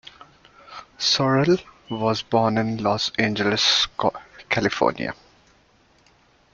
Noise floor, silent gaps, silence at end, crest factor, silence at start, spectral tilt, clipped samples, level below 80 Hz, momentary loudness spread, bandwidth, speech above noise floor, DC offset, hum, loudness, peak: -58 dBFS; none; 1.4 s; 20 dB; 0.7 s; -4 dB/octave; under 0.1%; -56 dBFS; 18 LU; 7.6 kHz; 37 dB; under 0.1%; none; -21 LUFS; -4 dBFS